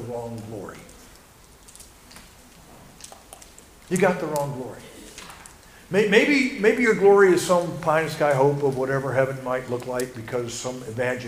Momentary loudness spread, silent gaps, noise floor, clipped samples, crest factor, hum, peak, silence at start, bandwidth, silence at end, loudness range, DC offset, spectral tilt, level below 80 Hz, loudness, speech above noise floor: 24 LU; none; -50 dBFS; under 0.1%; 20 dB; none; -4 dBFS; 0 s; 15.5 kHz; 0 s; 11 LU; under 0.1%; -5 dB/octave; -56 dBFS; -22 LUFS; 28 dB